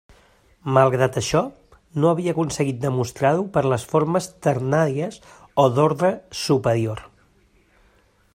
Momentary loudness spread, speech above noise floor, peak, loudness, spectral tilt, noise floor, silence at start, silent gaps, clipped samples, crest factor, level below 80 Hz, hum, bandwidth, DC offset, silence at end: 10 LU; 38 dB; -2 dBFS; -21 LUFS; -6 dB/octave; -59 dBFS; 0.65 s; none; under 0.1%; 20 dB; -54 dBFS; none; 16 kHz; under 0.1%; 1.3 s